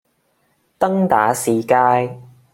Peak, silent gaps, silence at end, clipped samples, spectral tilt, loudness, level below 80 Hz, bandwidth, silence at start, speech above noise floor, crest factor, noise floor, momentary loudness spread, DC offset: -2 dBFS; none; 0.3 s; under 0.1%; -5.5 dB/octave; -17 LUFS; -60 dBFS; 16.5 kHz; 0.8 s; 48 dB; 16 dB; -64 dBFS; 6 LU; under 0.1%